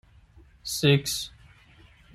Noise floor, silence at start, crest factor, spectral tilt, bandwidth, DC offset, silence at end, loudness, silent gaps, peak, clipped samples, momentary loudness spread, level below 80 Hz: -55 dBFS; 0.65 s; 22 dB; -4.5 dB/octave; 16 kHz; under 0.1%; 0.85 s; -25 LUFS; none; -6 dBFS; under 0.1%; 17 LU; -56 dBFS